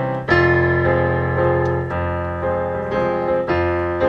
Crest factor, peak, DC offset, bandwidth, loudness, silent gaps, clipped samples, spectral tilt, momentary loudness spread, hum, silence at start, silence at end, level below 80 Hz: 16 dB; -2 dBFS; under 0.1%; 6.8 kHz; -19 LUFS; none; under 0.1%; -8.5 dB/octave; 7 LU; none; 0 s; 0 s; -42 dBFS